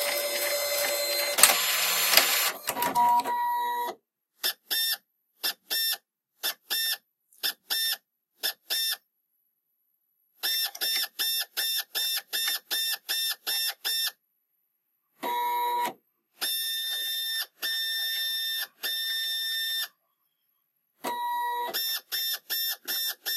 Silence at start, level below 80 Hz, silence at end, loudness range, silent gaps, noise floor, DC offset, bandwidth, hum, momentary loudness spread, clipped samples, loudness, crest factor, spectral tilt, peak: 0 s; -78 dBFS; 0 s; 8 LU; none; -77 dBFS; under 0.1%; 16 kHz; none; 9 LU; under 0.1%; -27 LUFS; 30 dB; 2 dB/octave; 0 dBFS